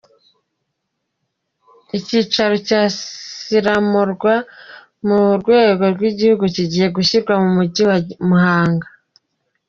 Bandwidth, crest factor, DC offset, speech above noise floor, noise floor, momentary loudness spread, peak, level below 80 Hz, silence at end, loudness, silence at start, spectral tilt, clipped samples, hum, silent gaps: 7.4 kHz; 16 dB; under 0.1%; 60 dB; -75 dBFS; 10 LU; -2 dBFS; -56 dBFS; 0.85 s; -16 LUFS; 1.95 s; -6 dB/octave; under 0.1%; none; none